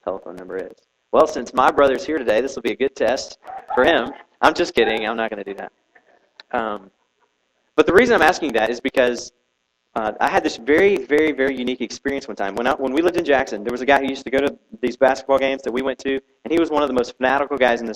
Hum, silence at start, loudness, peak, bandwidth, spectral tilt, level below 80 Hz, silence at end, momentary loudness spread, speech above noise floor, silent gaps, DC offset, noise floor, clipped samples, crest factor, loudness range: none; 0.05 s; -19 LUFS; 0 dBFS; 16 kHz; -4 dB/octave; -50 dBFS; 0 s; 14 LU; 52 dB; none; under 0.1%; -71 dBFS; under 0.1%; 20 dB; 2 LU